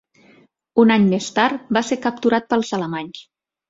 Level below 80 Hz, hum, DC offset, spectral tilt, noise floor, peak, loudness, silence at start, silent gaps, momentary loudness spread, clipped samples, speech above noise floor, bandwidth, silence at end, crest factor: -62 dBFS; none; under 0.1%; -5.5 dB/octave; -54 dBFS; -2 dBFS; -19 LUFS; 0.75 s; none; 13 LU; under 0.1%; 36 dB; 7.8 kHz; 0.5 s; 18 dB